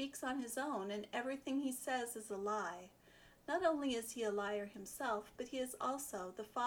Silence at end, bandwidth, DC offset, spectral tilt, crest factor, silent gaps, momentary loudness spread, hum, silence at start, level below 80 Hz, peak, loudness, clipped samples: 0 s; over 20 kHz; under 0.1%; -3 dB/octave; 18 dB; none; 9 LU; none; 0 s; -74 dBFS; -24 dBFS; -42 LUFS; under 0.1%